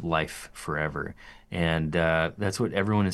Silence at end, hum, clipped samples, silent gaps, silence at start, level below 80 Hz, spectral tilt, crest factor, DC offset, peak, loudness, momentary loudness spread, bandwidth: 0 s; none; under 0.1%; none; 0 s; -50 dBFS; -6 dB/octave; 18 dB; under 0.1%; -10 dBFS; -28 LUFS; 12 LU; 12.5 kHz